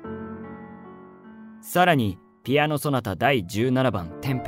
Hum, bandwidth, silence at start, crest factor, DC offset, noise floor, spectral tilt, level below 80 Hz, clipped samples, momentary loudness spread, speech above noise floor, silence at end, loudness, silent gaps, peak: none; 16 kHz; 0 s; 18 dB; under 0.1%; -45 dBFS; -6 dB/octave; -56 dBFS; under 0.1%; 22 LU; 22 dB; 0 s; -23 LUFS; none; -6 dBFS